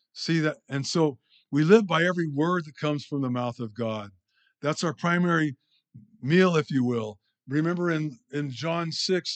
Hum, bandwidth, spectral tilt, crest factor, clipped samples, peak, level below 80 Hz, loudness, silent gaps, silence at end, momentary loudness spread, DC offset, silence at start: none; 8.8 kHz; -6 dB/octave; 22 dB; under 0.1%; -4 dBFS; -80 dBFS; -26 LUFS; none; 0 s; 12 LU; under 0.1%; 0.15 s